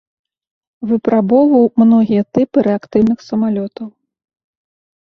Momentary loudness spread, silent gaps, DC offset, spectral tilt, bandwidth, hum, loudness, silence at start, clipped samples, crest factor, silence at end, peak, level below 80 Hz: 14 LU; none; under 0.1%; -9.5 dB/octave; 6.2 kHz; none; -13 LUFS; 0.8 s; under 0.1%; 14 dB; 1.15 s; -2 dBFS; -54 dBFS